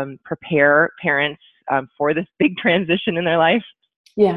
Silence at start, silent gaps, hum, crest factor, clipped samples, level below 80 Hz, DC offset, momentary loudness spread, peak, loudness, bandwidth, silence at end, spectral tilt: 0 s; 3.96-4.04 s; none; 16 dB; under 0.1%; -58 dBFS; under 0.1%; 10 LU; -2 dBFS; -18 LUFS; 5.4 kHz; 0 s; -8 dB/octave